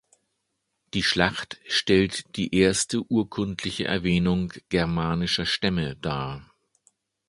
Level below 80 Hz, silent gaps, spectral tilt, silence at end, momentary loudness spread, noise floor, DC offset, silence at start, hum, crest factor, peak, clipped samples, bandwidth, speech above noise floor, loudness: -46 dBFS; none; -4.5 dB/octave; 0.85 s; 9 LU; -78 dBFS; under 0.1%; 0.95 s; none; 24 dB; -2 dBFS; under 0.1%; 11.5 kHz; 53 dB; -25 LUFS